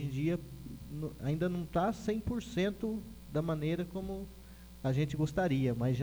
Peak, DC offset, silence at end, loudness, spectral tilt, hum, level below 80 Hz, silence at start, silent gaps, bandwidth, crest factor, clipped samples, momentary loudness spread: -18 dBFS; under 0.1%; 0 s; -35 LUFS; -7.5 dB/octave; none; -52 dBFS; 0 s; none; over 20 kHz; 16 dB; under 0.1%; 13 LU